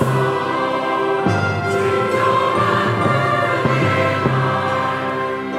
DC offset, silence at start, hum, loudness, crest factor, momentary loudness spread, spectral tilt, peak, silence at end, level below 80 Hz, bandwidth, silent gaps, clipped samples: under 0.1%; 0 s; 50 Hz at -40 dBFS; -18 LUFS; 14 dB; 3 LU; -6.5 dB/octave; -4 dBFS; 0 s; -52 dBFS; 15 kHz; none; under 0.1%